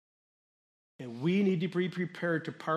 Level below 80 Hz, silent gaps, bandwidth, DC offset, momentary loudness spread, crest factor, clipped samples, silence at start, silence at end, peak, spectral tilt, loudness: -80 dBFS; none; 9.6 kHz; under 0.1%; 11 LU; 16 dB; under 0.1%; 1 s; 0 s; -18 dBFS; -7.5 dB/octave; -32 LUFS